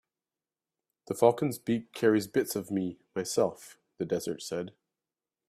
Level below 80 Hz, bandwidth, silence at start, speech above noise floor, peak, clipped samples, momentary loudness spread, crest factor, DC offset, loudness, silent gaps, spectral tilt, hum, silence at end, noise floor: -72 dBFS; 15.5 kHz; 1.1 s; over 60 dB; -8 dBFS; under 0.1%; 12 LU; 24 dB; under 0.1%; -30 LUFS; none; -5 dB/octave; none; 0.8 s; under -90 dBFS